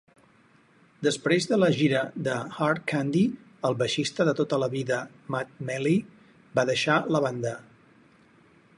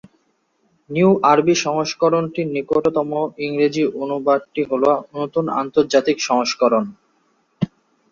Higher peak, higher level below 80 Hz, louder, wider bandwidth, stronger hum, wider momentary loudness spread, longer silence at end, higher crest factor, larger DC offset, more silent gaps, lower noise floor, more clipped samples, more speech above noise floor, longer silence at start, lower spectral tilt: second, -10 dBFS vs -2 dBFS; second, -68 dBFS vs -60 dBFS; second, -26 LUFS vs -19 LUFS; first, 11.5 kHz vs 7.4 kHz; neither; about the same, 9 LU vs 9 LU; first, 1.15 s vs 0.45 s; about the same, 18 dB vs 18 dB; neither; neither; second, -60 dBFS vs -65 dBFS; neither; second, 34 dB vs 47 dB; about the same, 1 s vs 0.9 s; about the same, -5.5 dB/octave vs -5 dB/octave